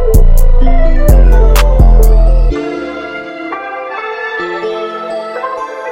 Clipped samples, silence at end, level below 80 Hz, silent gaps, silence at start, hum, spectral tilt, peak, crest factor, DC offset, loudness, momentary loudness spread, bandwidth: 0.3%; 0 s; -8 dBFS; none; 0 s; none; -6.5 dB/octave; 0 dBFS; 8 dB; under 0.1%; -13 LUFS; 12 LU; 16 kHz